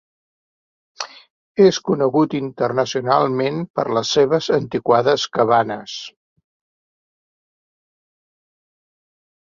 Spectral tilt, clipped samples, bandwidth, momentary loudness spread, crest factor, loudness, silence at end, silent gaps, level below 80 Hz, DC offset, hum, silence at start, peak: -5 dB/octave; under 0.1%; 7.4 kHz; 16 LU; 20 dB; -18 LUFS; 3.35 s; 1.30-1.55 s, 3.70-3.74 s; -62 dBFS; under 0.1%; none; 1 s; -2 dBFS